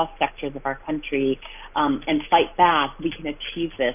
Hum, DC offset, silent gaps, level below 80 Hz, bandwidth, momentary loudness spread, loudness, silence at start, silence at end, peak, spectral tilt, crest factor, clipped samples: none; under 0.1%; none; -46 dBFS; 3.7 kHz; 11 LU; -23 LUFS; 0 s; 0 s; -4 dBFS; -8.5 dB/octave; 20 dB; under 0.1%